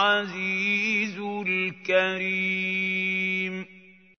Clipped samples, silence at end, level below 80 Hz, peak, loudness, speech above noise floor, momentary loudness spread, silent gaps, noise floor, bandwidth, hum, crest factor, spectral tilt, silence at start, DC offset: under 0.1%; 0.3 s; -80 dBFS; -8 dBFS; -25 LUFS; 27 dB; 7 LU; none; -52 dBFS; 6.6 kHz; none; 18 dB; -4.5 dB/octave; 0 s; under 0.1%